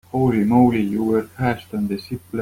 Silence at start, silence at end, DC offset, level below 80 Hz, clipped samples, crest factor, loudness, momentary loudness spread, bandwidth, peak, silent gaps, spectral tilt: 0.15 s; 0 s; under 0.1%; -48 dBFS; under 0.1%; 16 dB; -20 LUFS; 10 LU; 16 kHz; -4 dBFS; none; -8.5 dB/octave